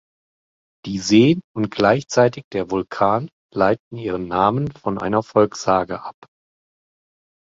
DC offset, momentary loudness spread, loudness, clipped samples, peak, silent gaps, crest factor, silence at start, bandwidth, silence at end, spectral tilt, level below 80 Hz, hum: under 0.1%; 12 LU; -19 LUFS; under 0.1%; -2 dBFS; 1.44-1.55 s, 2.44-2.51 s, 3.32-3.49 s, 3.80-3.91 s; 18 dB; 0.85 s; 7.8 kHz; 1.45 s; -6 dB/octave; -52 dBFS; none